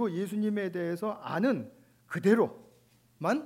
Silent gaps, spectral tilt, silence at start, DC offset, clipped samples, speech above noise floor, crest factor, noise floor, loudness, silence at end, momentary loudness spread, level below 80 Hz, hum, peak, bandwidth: none; -7 dB/octave; 0 s; under 0.1%; under 0.1%; 34 dB; 20 dB; -64 dBFS; -31 LUFS; 0 s; 9 LU; -80 dBFS; none; -12 dBFS; 16 kHz